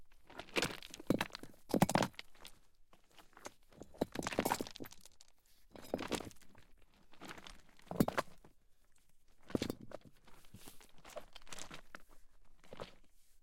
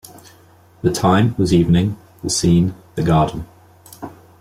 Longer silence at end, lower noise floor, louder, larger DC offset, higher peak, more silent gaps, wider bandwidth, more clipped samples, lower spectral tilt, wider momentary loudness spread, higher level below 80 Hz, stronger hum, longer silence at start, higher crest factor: second, 0.05 s vs 0.3 s; first, -64 dBFS vs -48 dBFS; second, -40 LUFS vs -17 LUFS; neither; second, -18 dBFS vs -4 dBFS; neither; about the same, 16.5 kHz vs 15.5 kHz; neither; second, -4.5 dB/octave vs -6 dB/octave; about the same, 22 LU vs 21 LU; second, -62 dBFS vs -40 dBFS; neither; second, 0 s vs 0.85 s; first, 26 dB vs 14 dB